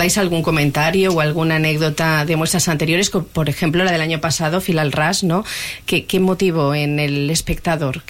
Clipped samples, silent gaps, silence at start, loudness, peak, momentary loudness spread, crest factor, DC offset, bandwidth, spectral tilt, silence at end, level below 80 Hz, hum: under 0.1%; none; 0 s; -17 LUFS; -6 dBFS; 4 LU; 12 dB; 0.3%; 17 kHz; -4.5 dB/octave; 0.1 s; -38 dBFS; none